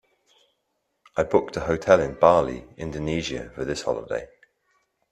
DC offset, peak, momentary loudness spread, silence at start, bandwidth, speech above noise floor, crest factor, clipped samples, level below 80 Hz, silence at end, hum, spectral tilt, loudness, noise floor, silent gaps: under 0.1%; 0 dBFS; 14 LU; 1.15 s; 10.5 kHz; 52 dB; 24 dB; under 0.1%; -50 dBFS; 0.85 s; none; -5.5 dB/octave; -24 LUFS; -75 dBFS; none